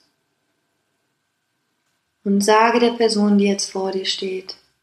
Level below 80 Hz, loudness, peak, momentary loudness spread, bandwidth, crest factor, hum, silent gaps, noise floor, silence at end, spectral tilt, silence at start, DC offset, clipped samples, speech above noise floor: -68 dBFS; -18 LUFS; -2 dBFS; 14 LU; 12.5 kHz; 18 dB; none; none; -72 dBFS; 0.3 s; -4.5 dB/octave; 2.25 s; under 0.1%; under 0.1%; 54 dB